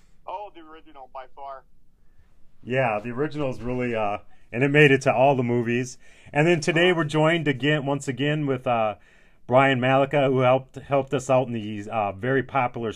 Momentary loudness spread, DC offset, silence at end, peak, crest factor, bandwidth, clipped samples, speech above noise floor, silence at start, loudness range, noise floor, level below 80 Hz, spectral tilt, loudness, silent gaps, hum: 17 LU; under 0.1%; 0 s; -4 dBFS; 20 dB; 11 kHz; under 0.1%; 27 dB; 0.15 s; 9 LU; -50 dBFS; -54 dBFS; -6 dB/octave; -22 LUFS; none; none